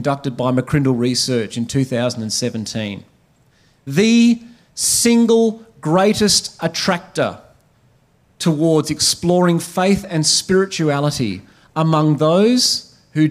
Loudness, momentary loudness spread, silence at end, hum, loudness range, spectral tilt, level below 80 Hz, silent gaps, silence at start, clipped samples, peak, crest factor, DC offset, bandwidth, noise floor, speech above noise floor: -16 LUFS; 10 LU; 0 s; none; 4 LU; -4.5 dB/octave; -50 dBFS; none; 0 s; under 0.1%; -2 dBFS; 16 dB; under 0.1%; 16 kHz; -56 dBFS; 40 dB